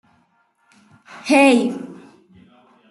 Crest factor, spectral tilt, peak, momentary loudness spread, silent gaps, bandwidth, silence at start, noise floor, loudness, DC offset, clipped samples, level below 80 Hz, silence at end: 18 dB; -4 dB/octave; -2 dBFS; 21 LU; none; 12 kHz; 1.15 s; -62 dBFS; -15 LUFS; under 0.1%; under 0.1%; -70 dBFS; 0.95 s